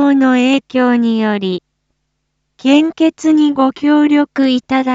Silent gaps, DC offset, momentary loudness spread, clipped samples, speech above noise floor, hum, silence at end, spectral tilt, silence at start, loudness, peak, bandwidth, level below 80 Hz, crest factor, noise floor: none; under 0.1%; 6 LU; under 0.1%; 57 dB; none; 0 s; -5.5 dB/octave; 0 s; -13 LUFS; 0 dBFS; 7.8 kHz; -60 dBFS; 12 dB; -69 dBFS